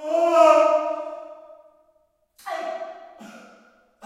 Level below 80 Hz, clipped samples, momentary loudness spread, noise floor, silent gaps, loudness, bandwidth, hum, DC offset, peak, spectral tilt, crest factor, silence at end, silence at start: -80 dBFS; under 0.1%; 27 LU; -65 dBFS; none; -19 LUFS; 12.5 kHz; none; under 0.1%; -2 dBFS; -2.5 dB/octave; 20 dB; 0.7 s; 0 s